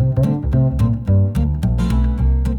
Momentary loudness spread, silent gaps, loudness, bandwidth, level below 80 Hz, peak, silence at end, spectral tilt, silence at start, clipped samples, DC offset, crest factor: 3 LU; none; -18 LUFS; 11 kHz; -20 dBFS; -6 dBFS; 0 s; -9.5 dB/octave; 0 s; under 0.1%; under 0.1%; 10 dB